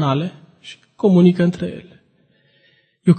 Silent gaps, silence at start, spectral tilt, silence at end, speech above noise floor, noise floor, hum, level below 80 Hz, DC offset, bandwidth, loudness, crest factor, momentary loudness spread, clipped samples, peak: none; 0 s; -8.5 dB/octave; 0 s; 43 dB; -59 dBFS; none; -56 dBFS; under 0.1%; 8.8 kHz; -17 LUFS; 18 dB; 26 LU; under 0.1%; -2 dBFS